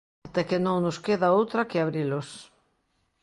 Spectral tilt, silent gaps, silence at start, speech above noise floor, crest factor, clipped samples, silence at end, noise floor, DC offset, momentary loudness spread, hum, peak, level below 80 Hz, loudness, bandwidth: -6.5 dB/octave; none; 0.25 s; 47 dB; 16 dB; under 0.1%; 0.8 s; -72 dBFS; under 0.1%; 11 LU; none; -10 dBFS; -64 dBFS; -26 LUFS; 11.5 kHz